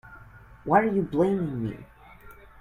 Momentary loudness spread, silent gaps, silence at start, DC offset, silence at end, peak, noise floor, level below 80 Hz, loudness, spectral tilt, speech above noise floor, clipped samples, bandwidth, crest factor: 16 LU; none; 0.05 s; under 0.1%; 0.3 s; -6 dBFS; -49 dBFS; -54 dBFS; -25 LUFS; -9 dB/octave; 25 dB; under 0.1%; 15 kHz; 20 dB